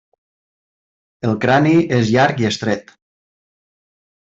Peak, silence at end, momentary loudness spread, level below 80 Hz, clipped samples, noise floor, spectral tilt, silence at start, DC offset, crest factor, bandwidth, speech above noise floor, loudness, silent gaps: -2 dBFS; 1.5 s; 10 LU; -56 dBFS; under 0.1%; under -90 dBFS; -6 dB/octave; 1.25 s; under 0.1%; 16 dB; 7.8 kHz; over 75 dB; -16 LUFS; none